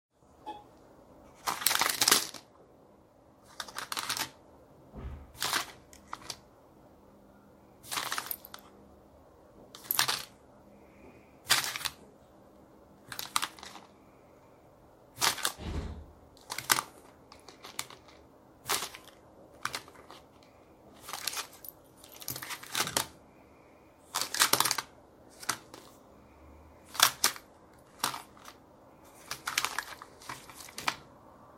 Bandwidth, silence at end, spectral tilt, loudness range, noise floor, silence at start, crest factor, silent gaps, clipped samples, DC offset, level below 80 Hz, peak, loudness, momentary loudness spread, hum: 16.5 kHz; 0 s; 0 dB/octave; 10 LU; -60 dBFS; 0.4 s; 36 dB; none; under 0.1%; under 0.1%; -58 dBFS; -2 dBFS; -32 LUFS; 25 LU; none